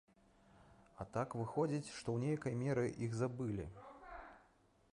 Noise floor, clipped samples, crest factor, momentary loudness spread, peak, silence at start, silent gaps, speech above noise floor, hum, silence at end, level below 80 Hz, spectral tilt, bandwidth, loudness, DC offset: -72 dBFS; under 0.1%; 16 dB; 16 LU; -26 dBFS; 0.55 s; none; 32 dB; none; 0.55 s; -66 dBFS; -7 dB/octave; 11 kHz; -41 LUFS; under 0.1%